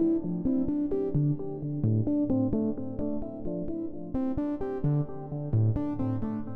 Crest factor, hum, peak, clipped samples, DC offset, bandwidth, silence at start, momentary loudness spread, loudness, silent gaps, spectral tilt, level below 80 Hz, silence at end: 12 dB; none; -16 dBFS; under 0.1%; under 0.1%; 3.1 kHz; 0 s; 8 LU; -30 LUFS; none; -13 dB/octave; -46 dBFS; 0 s